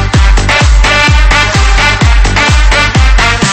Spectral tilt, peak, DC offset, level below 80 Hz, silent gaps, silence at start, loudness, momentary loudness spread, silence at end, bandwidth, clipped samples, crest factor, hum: -4 dB/octave; 0 dBFS; under 0.1%; -8 dBFS; none; 0 s; -7 LUFS; 2 LU; 0 s; 8.8 kHz; 1%; 6 dB; none